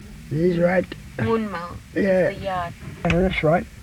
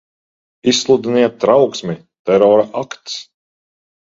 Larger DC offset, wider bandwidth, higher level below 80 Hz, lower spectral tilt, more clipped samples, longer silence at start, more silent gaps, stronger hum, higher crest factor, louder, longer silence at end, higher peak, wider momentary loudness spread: neither; first, 15 kHz vs 8 kHz; first, -40 dBFS vs -58 dBFS; first, -7.5 dB/octave vs -4.5 dB/octave; neither; second, 0 s vs 0.65 s; second, none vs 2.19-2.25 s; neither; about the same, 16 dB vs 16 dB; second, -22 LUFS vs -14 LUFS; second, 0 s vs 0.9 s; second, -6 dBFS vs 0 dBFS; second, 10 LU vs 15 LU